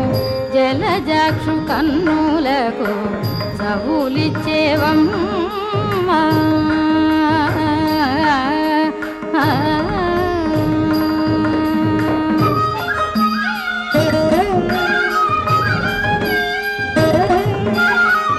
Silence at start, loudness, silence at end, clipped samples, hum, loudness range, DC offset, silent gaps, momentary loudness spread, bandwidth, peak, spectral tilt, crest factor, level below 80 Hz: 0 s; -16 LUFS; 0 s; under 0.1%; none; 2 LU; under 0.1%; none; 5 LU; 12.5 kHz; -2 dBFS; -6.5 dB/octave; 14 dB; -40 dBFS